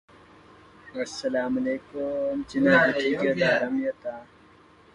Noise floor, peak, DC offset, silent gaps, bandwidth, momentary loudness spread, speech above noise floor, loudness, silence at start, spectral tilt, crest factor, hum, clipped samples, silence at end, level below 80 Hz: -55 dBFS; -8 dBFS; under 0.1%; none; 10.5 kHz; 16 LU; 30 dB; -25 LUFS; 0.85 s; -5.5 dB/octave; 20 dB; none; under 0.1%; 0.7 s; -60 dBFS